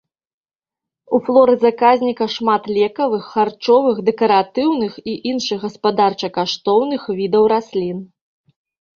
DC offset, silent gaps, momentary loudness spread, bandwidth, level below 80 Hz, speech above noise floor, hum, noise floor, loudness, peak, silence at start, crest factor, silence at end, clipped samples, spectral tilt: under 0.1%; none; 9 LU; 7.2 kHz; -60 dBFS; 72 dB; none; -88 dBFS; -17 LUFS; -2 dBFS; 1.1 s; 16 dB; 0.95 s; under 0.1%; -5.5 dB/octave